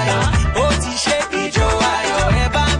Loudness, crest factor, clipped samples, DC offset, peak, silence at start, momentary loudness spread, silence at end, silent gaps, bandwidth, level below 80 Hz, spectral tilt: -17 LUFS; 10 dB; under 0.1%; under 0.1%; -6 dBFS; 0 s; 2 LU; 0 s; none; 10.5 kHz; -24 dBFS; -4 dB/octave